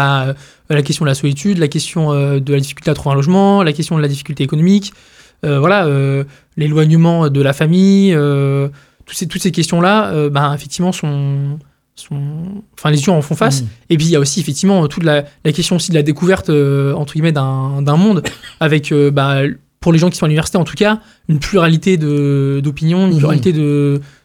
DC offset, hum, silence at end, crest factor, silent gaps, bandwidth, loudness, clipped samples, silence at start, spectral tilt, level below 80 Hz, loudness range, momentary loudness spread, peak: under 0.1%; none; 0.15 s; 12 dB; none; 14.5 kHz; -14 LUFS; under 0.1%; 0 s; -6 dB/octave; -44 dBFS; 3 LU; 8 LU; 0 dBFS